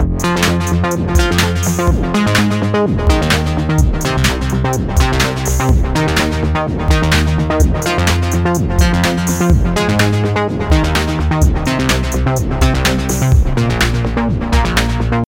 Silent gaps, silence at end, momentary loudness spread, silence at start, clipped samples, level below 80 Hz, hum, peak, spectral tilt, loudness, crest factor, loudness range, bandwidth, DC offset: none; 0.05 s; 3 LU; 0 s; under 0.1%; -18 dBFS; none; 0 dBFS; -5 dB/octave; -14 LUFS; 14 dB; 1 LU; 17 kHz; under 0.1%